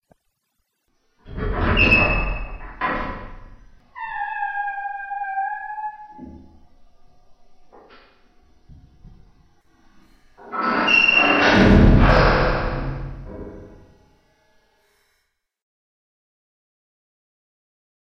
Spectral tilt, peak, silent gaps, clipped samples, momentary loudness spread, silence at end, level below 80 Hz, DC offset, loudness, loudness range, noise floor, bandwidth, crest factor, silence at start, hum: -6.5 dB/octave; -2 dBFS; none; under 0.1%; 23 LU; 4.45 s; -30 dBFS; under 0.1%; -18 LUFS; 18 LU; -73 dBFS; 6.4 kHz; 20 dB; 1.25 s; none